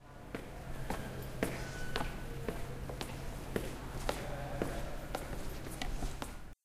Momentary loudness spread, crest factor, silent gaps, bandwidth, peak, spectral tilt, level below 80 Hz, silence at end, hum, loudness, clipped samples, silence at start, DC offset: 6 LU; 26 dB; none; 15.5 kHz; -12 dBFS; -5 dB/octave; -44 dBFS; 0.1 s; none; -42 LUFS; under 0.1%; 0 s; under 0.1%